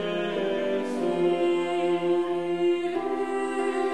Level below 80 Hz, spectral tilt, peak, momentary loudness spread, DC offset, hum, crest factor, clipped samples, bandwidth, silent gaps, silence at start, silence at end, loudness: -70 dBFS; -6 dB/octave; -14 dBFS; 4 LU; 0.4%; none; 12 dB; under 0.1%; 10.5 kHz; none; 0 s; 0 s; -26 LUFS